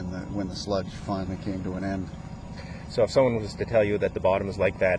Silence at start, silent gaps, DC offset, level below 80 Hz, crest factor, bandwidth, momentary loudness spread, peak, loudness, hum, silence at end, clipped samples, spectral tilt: 0 s; none; under 0.1%; -46 dBFS; 18 dB; 10.5 kHz; 15 LU; -10 dBFS; -27 LUFS; none; 0 s; under 0.1%; -6.5 dB/octave